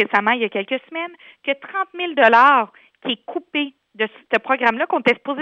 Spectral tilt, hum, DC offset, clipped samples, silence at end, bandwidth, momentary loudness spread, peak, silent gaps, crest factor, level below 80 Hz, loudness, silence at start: -5 dB/octave; none; under 0.1%; under 0.1%; 0 s; 8.2 kHz; 16 LU; 0 dBFS; none; 18 dB; -68 dBFS; -19 LUFS; 0 s